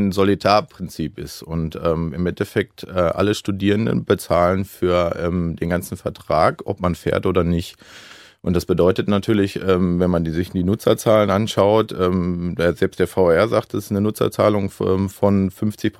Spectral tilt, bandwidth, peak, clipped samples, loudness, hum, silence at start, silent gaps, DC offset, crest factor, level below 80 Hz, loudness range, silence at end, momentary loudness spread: -6.5 dB/octave; 16 kHz; 0 dBFS; under 0.1%; -19 LUFS; none; 0 s; none; under 0.1%; 18 dB; -42 dBFS; 4 LU; 0.1 s; 8 LU